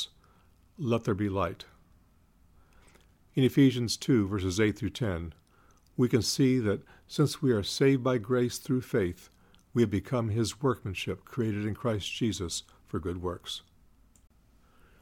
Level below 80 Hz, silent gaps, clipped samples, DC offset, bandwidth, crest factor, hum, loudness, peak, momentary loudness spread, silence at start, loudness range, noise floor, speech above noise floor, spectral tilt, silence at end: -60 dBFS; none; under 0.1%; under 0.1%; 16.5 kHz; 18 dB; none; -30 LUFS; -12 dBFS; 12 LU; 0 s; 6 LU; -62 dBFS; 34 dB; -5.5 dB/octave; 1.4 s